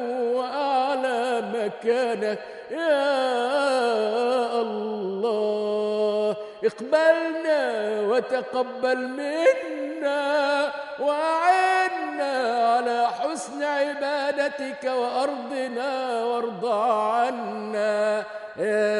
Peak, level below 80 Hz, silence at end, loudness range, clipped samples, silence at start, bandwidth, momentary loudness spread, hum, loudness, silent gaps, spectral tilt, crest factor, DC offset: -6 dBFS; -78 dBFS; 0 s; 3 LU; under 0.1%; 0 s; 11.5 kHz; 7 LU; none; -24 LUFS; none; -4 dB/octave; 18 dB; under 0.1%